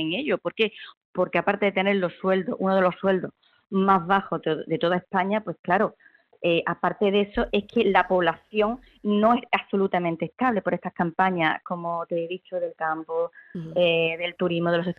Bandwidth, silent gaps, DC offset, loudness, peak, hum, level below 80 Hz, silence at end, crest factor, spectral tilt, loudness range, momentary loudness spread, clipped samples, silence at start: 5.6 kHz; 0.97-1.13 s, 5.59-5.64 s; under 0.1%; -24 LUFS; -2 dBFS; none; -54 dBFS; 0.05 s; 22 dB; -8 dB/octave; 3 LU; 8 LU; under 0.1%; 0 s